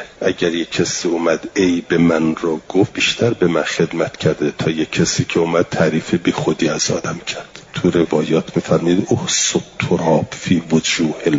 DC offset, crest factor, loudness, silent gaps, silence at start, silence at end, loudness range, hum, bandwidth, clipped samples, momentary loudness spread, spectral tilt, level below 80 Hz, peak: under 0.1%; 14 dB; -17 LUFS; none; 0 s; 0 s; 1 LU; none; 7.8 kHz; under 0.1%; 5 LU; -4.5 dB/octave; -50 dBFS; -2 dBFS